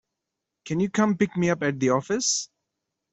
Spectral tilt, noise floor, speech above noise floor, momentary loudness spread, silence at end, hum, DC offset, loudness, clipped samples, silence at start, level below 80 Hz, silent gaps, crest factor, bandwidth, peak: -4.5 dB/octave; -84 dBFS; 60 dB; 5 LU; 0.7 s; none; under 0.1%; -24 LUFS; under 0.1%; 0.65 s; -64 dBFS; none; 20 dB; 8.2 kHz; -8 dBFS